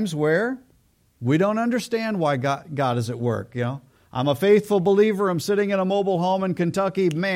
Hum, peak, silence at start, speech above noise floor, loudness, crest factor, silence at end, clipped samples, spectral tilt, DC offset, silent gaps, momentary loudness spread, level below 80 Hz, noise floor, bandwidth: none; -6 dBFS; 0 s; 40 dB; -22 LUFS; 16 dB; 0 s; under 0.1%; -6.5 dB/octave; under 0.1%; none; 10 LU; -64 dBFS; -61 dBFS; 16 kHz